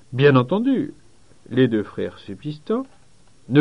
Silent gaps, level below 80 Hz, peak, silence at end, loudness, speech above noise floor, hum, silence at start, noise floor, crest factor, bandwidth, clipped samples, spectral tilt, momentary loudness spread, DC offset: none; -60 dBFS; -2 dBFS; 0 s; -21 LUFS; 35 dB; none; 0.1 s; -55 dBFS; 18 dB; 10 kHz; under 0.1%; -8.5 dB/octave; 17 LU; 0.3%